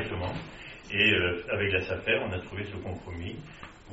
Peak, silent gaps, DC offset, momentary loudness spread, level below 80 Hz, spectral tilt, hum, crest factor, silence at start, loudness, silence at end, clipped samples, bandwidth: -10 dBFS; none; under 0.1%; 20 LU; -54 dBFS; -2.5 dB/octave; none; 20 dB; 0 s; -29 LUFS; 0 s; under 0.1%; 7.6 kHz